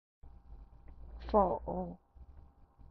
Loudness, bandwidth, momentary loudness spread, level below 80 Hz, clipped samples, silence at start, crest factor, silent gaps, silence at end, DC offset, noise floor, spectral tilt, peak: -34 LUFS; 5.8 kHz; 27 LU; -50 dBFS; under 0.1%; 0.25 s; 24 dB; none; 0.1 s; under 0.1%; -58 dBFS; -8 dB/octave; -14 dBFS